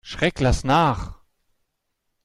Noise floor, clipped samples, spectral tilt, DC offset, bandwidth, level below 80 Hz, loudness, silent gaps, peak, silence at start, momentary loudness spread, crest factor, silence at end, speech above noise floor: -76 dBFS; under 0.1%; -5.5 dB/octave; under 0.1%; 12.5 kHz; -34 dBFS; -21 LUFS; none; -6 dBFS; 0.05 s; 12 LU; 16 dB; 1.1 s; 56 dB